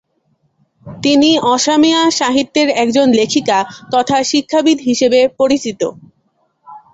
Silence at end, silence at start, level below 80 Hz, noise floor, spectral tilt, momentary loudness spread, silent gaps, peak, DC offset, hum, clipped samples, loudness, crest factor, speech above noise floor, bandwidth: 0.15 s; 0.85 s; -54 dBFS; -62 dBFS; -3 dB/octave; 6 LU; none; 0 dBFS; under 0.1%; none; under 0.1%; -13 LUFS; 14 dB; 49 dB; 8.2 kHz